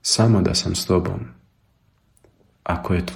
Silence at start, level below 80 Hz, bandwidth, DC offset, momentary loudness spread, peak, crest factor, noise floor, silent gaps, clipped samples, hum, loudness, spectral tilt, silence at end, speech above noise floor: 0.05 s; -42 dBFS; 16.5 kHz; under 0.1%; 16 LU; -4 dBFS; 18 dB; -62 dBFS; none; under 0.1%; none; -20 LUFS; -5 dB/octave; 0 s; 42 dB